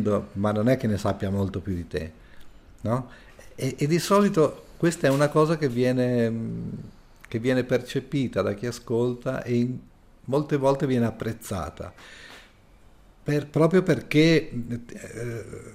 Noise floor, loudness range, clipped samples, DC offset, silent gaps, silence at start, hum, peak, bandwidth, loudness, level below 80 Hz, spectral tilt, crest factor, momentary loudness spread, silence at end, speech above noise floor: -53 dBFS; 5 LU; under 0.1%; under 0.1%; none; 0 s; none; -8 dBFS; 16 kHz; -25 LUFS; -52 dBFS; -6.5 dB/octave; 18 dB; 16 LU; 0 s; 29 dB